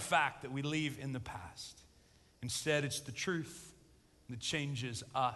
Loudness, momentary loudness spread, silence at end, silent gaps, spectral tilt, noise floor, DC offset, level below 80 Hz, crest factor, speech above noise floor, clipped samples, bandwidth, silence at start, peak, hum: -38 LUFS; 15 LU; 0 s; none; -4 dB/octave; -66 dBFS; under 0.1%; -64 dBFS; 22 dB; 28 dB; under 0.1%; 12 kHz; 0 s; -18 dBFS; none